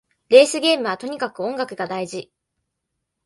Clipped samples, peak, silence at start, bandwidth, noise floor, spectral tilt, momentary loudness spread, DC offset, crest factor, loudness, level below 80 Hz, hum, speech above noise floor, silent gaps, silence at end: under 0.1%; 0 dBFS; 0.3 s; 11.5 kHz; -78 dBFS; -3 dB/octave; 14 LU; under 0.1%; 20 dB; -19 LUFS; -70 dBFS; none; 60 dB; none; 1 s